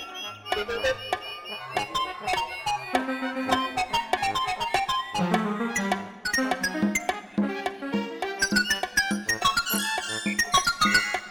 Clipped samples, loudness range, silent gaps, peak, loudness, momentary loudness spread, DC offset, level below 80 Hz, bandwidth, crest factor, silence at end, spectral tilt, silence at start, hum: under 0.1%; 4 LU; none; -6 dBFS; -26 LUFS; 8 LU; under 0.1%; -54 dBFS; 19 kHz; 20 dB; 0 s; -2.5 dB/octave; 0 s; none